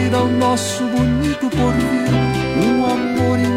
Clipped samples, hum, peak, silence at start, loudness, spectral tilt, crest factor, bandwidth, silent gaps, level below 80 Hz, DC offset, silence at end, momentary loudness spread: under 0.1%; none; -4 dBFS; 0 s; -17 LUFS; -6 dB/octave; 12 dB; 15.5 kHz; none; -34 dBFS; under 0.1%; 0 s; 2 LU